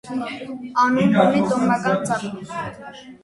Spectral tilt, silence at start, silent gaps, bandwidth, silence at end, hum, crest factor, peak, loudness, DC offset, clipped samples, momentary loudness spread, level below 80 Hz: -6 dB/octave; 0.05 s; none; 11.5 kHz; 0.1 s; none; 20 dB; 0 dBFS; -20 LUFS; under 0.1%; under 0.1%; 16 LU; -58 dBFS